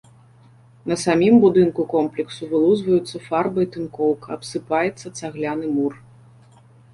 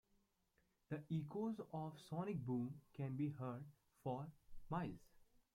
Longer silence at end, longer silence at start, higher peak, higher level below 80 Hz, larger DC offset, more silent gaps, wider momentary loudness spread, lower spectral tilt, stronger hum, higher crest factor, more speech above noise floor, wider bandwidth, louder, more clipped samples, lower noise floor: first, 0.95 s vs 0.3 s; about the same, 0.85 s vs 0.9 s; first, -4 dBFS vs -32 dBFS; first, -56 dBFS vs -72 dBFS; neither; neither; first, 14 LU vs 8 LU; second, -6 dB/octave vs -9 dB/octave; neither; about the same, 16 dB vs 16 dB; second, 31 dB vs 36 dB; second, 11.5 kHz vs 15.5 kHz; first, -20 LUFS vs -48 LUFS; neither; second, -50 dBFS vs -82 dBFS